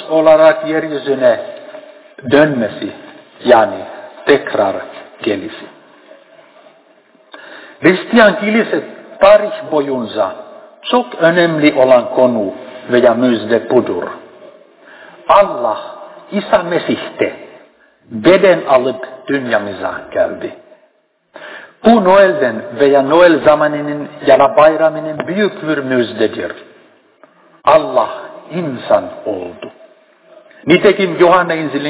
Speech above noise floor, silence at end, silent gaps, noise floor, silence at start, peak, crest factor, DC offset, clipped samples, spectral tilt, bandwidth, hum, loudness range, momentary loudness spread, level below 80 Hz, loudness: 45 dB; 0 s; none; -57 dBFS; 0 s; 0 dBFS; 14 dB; under 0.1%; 0.4%; -9.5 dB/octave; 4 kHz; none; 6 LU; 19 LU; -54 dBFS; -13 LUFS